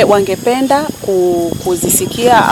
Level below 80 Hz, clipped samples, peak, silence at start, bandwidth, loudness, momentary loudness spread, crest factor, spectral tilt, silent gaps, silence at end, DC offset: -42 dBFS; 0.1%; 0 dBFS; 0 s; 18 kHz; -12 LUFS; 5 LU; 12 dB; -4 dB/octave; none; 0 s; under 0.1%